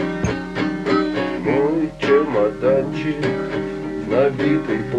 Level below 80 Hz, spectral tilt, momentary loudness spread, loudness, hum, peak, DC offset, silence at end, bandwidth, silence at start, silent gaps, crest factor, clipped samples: -44 dBFS; -7 dB/octave; 6 LU; -20 LUFS; none; -4 dBFS; under 0.1%; 0 s; 9.6 kHz; 0 s; none; 16 dB; under 0.1%